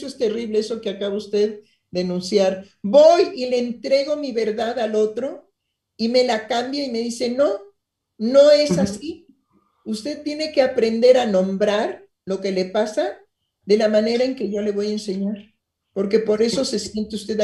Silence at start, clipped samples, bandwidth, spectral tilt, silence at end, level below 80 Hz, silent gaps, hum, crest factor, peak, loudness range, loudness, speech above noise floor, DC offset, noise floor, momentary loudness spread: 0 s; under 0.1%; 12 kHz; -5 dB/octave; 0 s; -60 dBFS; none; none; 18 dB; -2 dBFS; 4 LU; -20 LUFS; 54 dB; under 0.1%; -74 dBFS; 14 LU